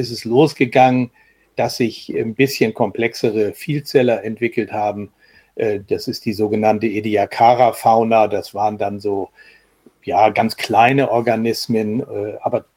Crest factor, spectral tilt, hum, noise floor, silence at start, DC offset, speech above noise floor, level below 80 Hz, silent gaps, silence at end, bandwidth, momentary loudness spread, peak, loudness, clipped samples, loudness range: 18 dB; -6 dB/octave; none; -52 dBFS; 0 s; under 0.1%; 35 dB; -60 dBFS; none; 0.15 s; 17 kHz; 10 LU; 0 dBFS; -17 LUFS; under 0.1%; 4 LU